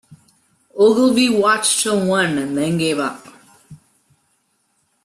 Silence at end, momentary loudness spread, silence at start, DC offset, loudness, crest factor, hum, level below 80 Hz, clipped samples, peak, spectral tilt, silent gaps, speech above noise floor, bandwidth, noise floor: 1.3 s; 10 LU; 0.1 s; under 0.1%; -16 LUFS; 16 dB; none; -60 dBFS; under 0.1%; -4 dBFS; -3.5 dB/octave; none; 49 dB; 13.5 kHz; -65 dBFS